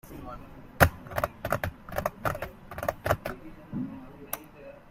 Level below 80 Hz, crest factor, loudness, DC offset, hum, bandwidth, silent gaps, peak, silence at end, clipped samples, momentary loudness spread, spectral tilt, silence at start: -46 dBFS; 30 dB; -31 LUFS; under 0.1%; none; 16 kHz; none; -2 dBFS; 0 s; under 0.1%; 21 LU; -5.5 dB/octave; 0.05 s